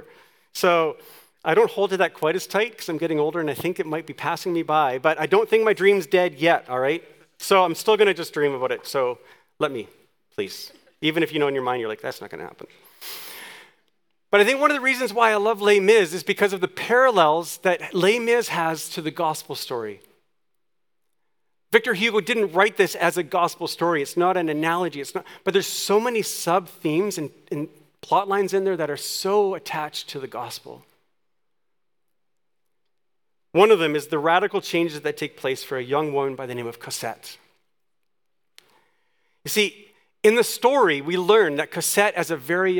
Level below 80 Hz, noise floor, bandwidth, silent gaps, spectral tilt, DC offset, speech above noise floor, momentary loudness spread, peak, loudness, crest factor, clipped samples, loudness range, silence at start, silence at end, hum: -78 dBFS; -82 dBFS; 19.5 kHz; none; -4 dB/octave; under 0.1%; 60 dB; 14 LU; -2 dBFS; -22 LUFS; 22 dB; under 0.1%; 9 LU; 0.55 s; 0 s; none